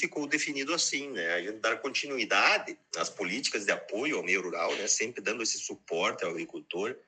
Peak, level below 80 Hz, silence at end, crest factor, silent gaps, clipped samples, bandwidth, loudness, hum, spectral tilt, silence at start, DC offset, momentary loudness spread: -8 dBFS; -86 dBFS; 0.1 s; 22 dB; none; under 0.1%; 9.4 kHz; -30 LUFS; none; -1 dB/octave; 0 s; under 0.1%; 9 LU